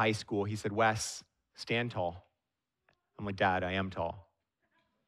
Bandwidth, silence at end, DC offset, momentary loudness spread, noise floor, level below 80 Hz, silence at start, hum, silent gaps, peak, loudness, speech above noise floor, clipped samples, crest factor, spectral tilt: 14.5 kHz; 0.85 s; under 0.1%; 13 LU; -88 dBFS; -64 dBFS; 0 s; none; none; -16 dBFS; -34 LUFS; 54 dB; under 0.1%; 20 dB; -4.5 dB/octave